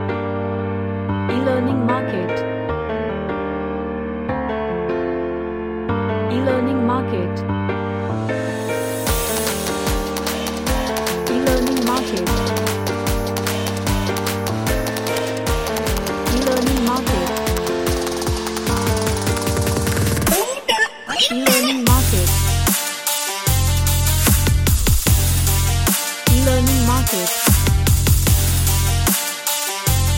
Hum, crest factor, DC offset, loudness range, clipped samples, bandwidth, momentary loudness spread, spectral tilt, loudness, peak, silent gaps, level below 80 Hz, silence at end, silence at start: none; 18 dB; under 0.1%; 5 LU; under 0.1%; 17 kHz; 8 LU; -4 dB/octave; -19 LUFS; 0 dBFS; none; -28 dBFS; 0 s; 0 s